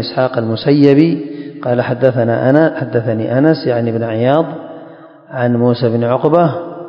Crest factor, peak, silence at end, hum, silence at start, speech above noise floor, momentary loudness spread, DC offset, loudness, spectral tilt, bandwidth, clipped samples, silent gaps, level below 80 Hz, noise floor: 14 dB; 0 dBFS; 0 s; none; 0 s; 24 dB; 11 LU; under 0.1%; -13 LUFS; -10 dB/octave; 5.4 kHz; 0.2%; none; -58 dBFS; -36 dBFS